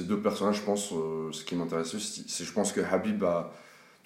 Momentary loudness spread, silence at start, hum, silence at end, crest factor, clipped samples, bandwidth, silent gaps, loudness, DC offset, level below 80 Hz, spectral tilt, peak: 7 LU; 0 s; none; 0.25 s; 18 dB; under 0.1%; 16 kHz; none; -31 LUFS; under 0.1%; -70 dBFS; -4.5 dB/octave; -12 dBFS